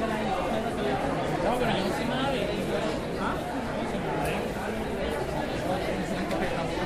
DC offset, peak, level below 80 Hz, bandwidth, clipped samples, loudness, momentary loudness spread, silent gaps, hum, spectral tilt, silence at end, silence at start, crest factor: under 0.1%; -14 dBFS; -44 dBFS; 15.5 kHz; under 0.1%; -29 LUFS; 4 LU; none; none; -5.5 dB/octave; 0 s; 0 s; 14 dB